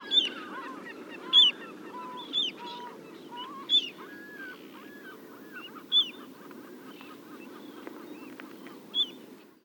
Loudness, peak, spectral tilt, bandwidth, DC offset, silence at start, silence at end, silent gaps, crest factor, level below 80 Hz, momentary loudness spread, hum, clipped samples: -25 LUFS; -10 dBFS; -1.5 dB/octave; 19.5 kHz; under 0.1%; 0 s; 0.2 s; none; 22 dB; -88 dBFS; 23 LU; none; under 0.1%